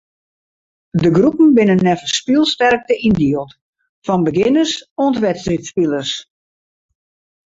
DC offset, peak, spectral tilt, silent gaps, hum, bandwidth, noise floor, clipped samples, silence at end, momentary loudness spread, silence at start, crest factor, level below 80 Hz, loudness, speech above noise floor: under 0.1%; -2 dBFS; -5.5 dB/octave; 3.61-3.73 s, 3.89-4.02 s, 4.91-4.96 s; none; 8 kHz; under -90 dBFS; under 0.1%; 1.25 s; 11 LU; 0.95 s; 14 dB; -48 dBFS; -15 LUFS; over 76 dB